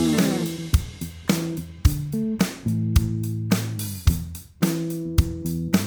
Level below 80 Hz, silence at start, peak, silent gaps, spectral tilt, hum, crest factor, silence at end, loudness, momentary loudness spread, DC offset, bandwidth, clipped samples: -30 dBFS; 0 s; -4 dBFS; none; -5.5 dB/octave; none; 20 dB; 0 s; -25 LUFS; 6 LU; under 0.1%; over 20 kHz; under 0.1%